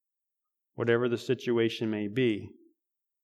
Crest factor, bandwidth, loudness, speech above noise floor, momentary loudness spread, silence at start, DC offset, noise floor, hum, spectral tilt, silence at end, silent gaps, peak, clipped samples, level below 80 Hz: 20 dB; 12.5 kHz; -29 LUFS; 58 dB; 6 LU; 0.8 s; under 0.1%; -87 dBFS; none; -6.5 dB/octave; 0.75 s; none; -12 dBFS; under 0.1%; -74 dBFS